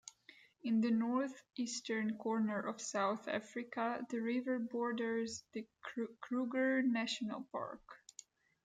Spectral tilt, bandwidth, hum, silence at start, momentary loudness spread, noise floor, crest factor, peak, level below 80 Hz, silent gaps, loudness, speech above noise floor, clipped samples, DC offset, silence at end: -4.5 dB/octave; 9.4 kHz; none; 0.05 s; 13 LU; -65 dBFS; 14 dB; -24 dBFS; -84 dBFS; none; -39 LUFS; 26 dB; under 0.1%; under 0.1%; 0.7 s